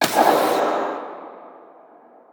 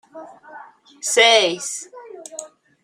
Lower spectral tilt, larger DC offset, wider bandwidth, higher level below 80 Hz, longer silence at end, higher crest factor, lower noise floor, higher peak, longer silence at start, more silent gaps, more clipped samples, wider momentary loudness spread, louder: first, -3 dB/octave vs 0 dB/octave; neither; first, over 20 kHz vs 16 kHz; first, -68 dBFS vs -76 dBFS; first, 0.8 s vs 0.35 s; about the same, 20 dB vs 20 dB; first, -49 dBFS vs -38 dBFS; about the same, -2 dBFS vs -2 dBFS; second, 0 s vs 0.15 s; neither; neither; about the same, 23 LU vs 24 LU; second, -20 LUFS vs -16 LUFS